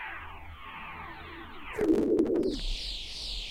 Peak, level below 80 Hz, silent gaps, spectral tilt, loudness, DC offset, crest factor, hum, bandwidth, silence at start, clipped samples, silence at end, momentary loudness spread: -14 dBFS; -44 dBFS; none; -5 dB/octave; -31 LUFS; under 0.1%; 18 dB; none; 15.5 kHz; 0 s; under 0.1%; 0 s; 18 LU